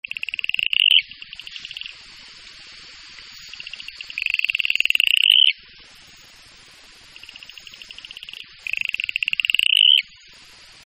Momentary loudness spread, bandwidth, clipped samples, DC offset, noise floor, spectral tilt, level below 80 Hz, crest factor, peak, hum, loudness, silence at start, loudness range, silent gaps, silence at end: 27 LU; 16 kHz; under 0.1%; under 0.1%; -47 dBFS; 3 dB/octave; -62 dBFS; 24 dB; 0 dBFS; none; -16 LUFS; 0.55 s; 14 LU; none; 0.85 s